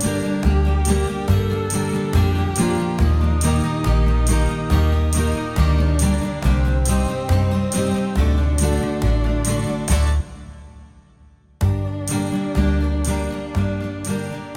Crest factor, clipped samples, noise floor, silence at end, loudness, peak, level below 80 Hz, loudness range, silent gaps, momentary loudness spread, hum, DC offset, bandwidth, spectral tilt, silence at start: 14 dB; under 0.1%; -50 dBFS; 0 s; -20 LUFS; -4 dBFS; -22 dBFS; 4 LU; none; 5 LU; none; under 0.1%; 15.5 kHz; -6 dB/octave; 0 s